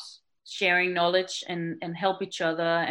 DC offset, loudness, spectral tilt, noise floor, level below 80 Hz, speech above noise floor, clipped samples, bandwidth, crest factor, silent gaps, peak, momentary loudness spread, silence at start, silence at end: under 0.1%; -26 LUFS; -4 dB/octave; -49 dBFS; -80 dBFS; 22 dB; under 0.1%; 16.5 kHz; 18 dB; none; -10 dBFS; 11 LU; 0 s; 0 s